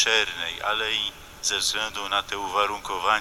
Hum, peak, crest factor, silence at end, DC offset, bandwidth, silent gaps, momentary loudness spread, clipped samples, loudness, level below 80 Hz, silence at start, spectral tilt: none; -6 dBFS; 20 dB; 0 s; under 0.1%; 17 kHz; none; 5 LU; under 0.1%; -25 LUFS; -52 dBFS; 0 s; 0 dB/octave